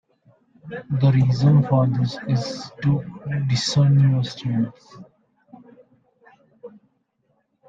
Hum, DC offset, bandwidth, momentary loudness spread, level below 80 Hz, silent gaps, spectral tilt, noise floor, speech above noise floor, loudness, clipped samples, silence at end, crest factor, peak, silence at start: none; under 0.1%; 7.8 kHz; 12 LU; -56 dBFS; none; -7 dB/octave; -69 dBFS; 49 dB; -20 LUFS; under 0.1%; 1 s; 18 dB; -4 dBFS; 0.65 s